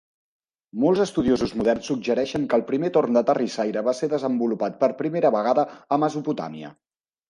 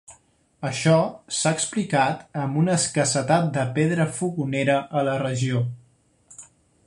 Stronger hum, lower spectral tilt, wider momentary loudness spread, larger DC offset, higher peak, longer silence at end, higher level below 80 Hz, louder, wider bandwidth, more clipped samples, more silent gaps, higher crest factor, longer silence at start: neither; about the same, -6 dB/octave vs -5 dB/octave; about the same, 7 LU vs 7 LU; neither; about the same, -8 dBFS vs -6 dBFS; first, 0.6 s vs 0.45 s; about the same, -56 dBFS vs -60 dBFS; about the same, -23 LUFS vs -23 LUFS; about the same, 11 kHz vs 11.5 kHz; neither; neither; about the same, 16 dB vs 18 dB; first, 0.75 s vs 0.1 s